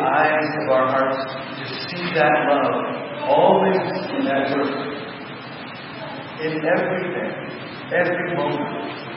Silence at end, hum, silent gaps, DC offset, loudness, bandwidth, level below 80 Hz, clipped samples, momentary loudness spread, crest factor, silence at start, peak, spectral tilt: 0 s; none; none; under 0.1%; -21 LUFS; 5.8 kHz; -68 dBFS; under 0.1%; 15 LU; 18 dB; 0 s; -4 dBFS; -10.5 dB/octave